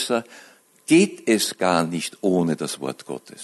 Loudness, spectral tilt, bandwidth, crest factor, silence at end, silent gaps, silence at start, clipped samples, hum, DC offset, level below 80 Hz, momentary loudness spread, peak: -21 LUFS; -4.5 dB/octave; 12.5 kHz; 18 dB; 0 s; none; 0 s; under 0.1%; none; under 0.1%; -64 dBFS; 14 LU; -4 dBFS